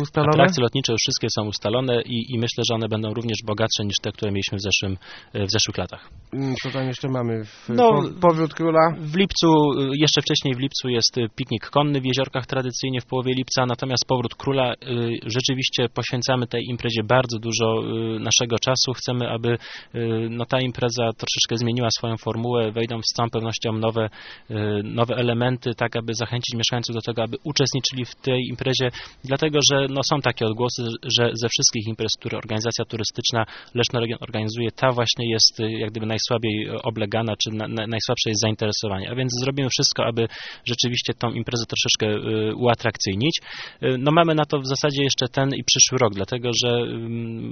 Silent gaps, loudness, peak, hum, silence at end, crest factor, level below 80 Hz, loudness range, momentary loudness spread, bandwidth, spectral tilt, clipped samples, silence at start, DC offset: none; -22 LUFS; 0 dBFS; none; 0 s; 22 dB; -54 dBFS; 4 LU; 9 LU; 6.8 kHz; -4 dB/octave; under 0.1%; 0 s; under 0.1%